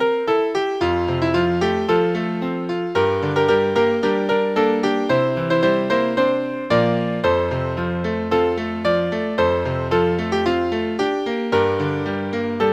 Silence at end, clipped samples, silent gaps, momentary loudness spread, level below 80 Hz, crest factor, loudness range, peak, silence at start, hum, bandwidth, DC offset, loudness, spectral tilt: 0 s; under 0.1%; none; 5 LU; -46 dBFS; 14 dB; 2 LU; -4 dBFS; 0 s; none; 9 kHz; under 0.1%; -20 LUFS; -7 dB/octave